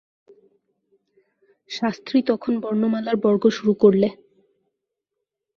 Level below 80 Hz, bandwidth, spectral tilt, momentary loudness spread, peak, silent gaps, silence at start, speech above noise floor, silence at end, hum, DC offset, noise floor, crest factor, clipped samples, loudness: -66 dBFS; 7 kHz; -7 dB/octave; 9 LU; -2 dBFS; none; 1.7 s; 62 dB; 1.4 s; none; under 0.1%; -82 dBFS; 20 dB; under 0.1%; -20 LUFS